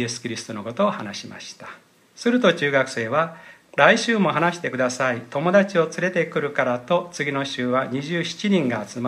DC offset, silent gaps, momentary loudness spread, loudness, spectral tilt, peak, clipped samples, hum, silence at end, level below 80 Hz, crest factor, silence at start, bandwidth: under 0.1%; none; 13 LU; -22 LUFS; -5 dB/octave; 0 dBFS; under 0.1%; none; 0 s; -70 dBFS; 22 dB; 0 s; 13 kHz